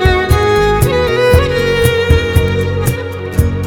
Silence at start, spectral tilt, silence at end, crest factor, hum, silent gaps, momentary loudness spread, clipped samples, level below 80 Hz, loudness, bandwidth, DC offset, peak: 0 s; -6 dB/octave; 0 s; 12 dB; none; none; 6 LU; under 0.1%; -20 dBFS; -12 LUFS; 19.5 kHz; under 0.1%; 0 dBFS